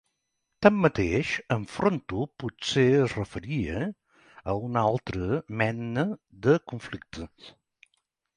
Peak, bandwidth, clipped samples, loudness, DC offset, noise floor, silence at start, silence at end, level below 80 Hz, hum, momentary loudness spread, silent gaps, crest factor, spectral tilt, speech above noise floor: -6 dBFS; 10.5 kHz; under 0.1%; -27 LUFS; under 0.1%; -79 dBFS; 0.6 s; 0.9 s; -50 dBFS; none; 16 LU; none; 22 dB; -6.5 dB/octave; 53 dB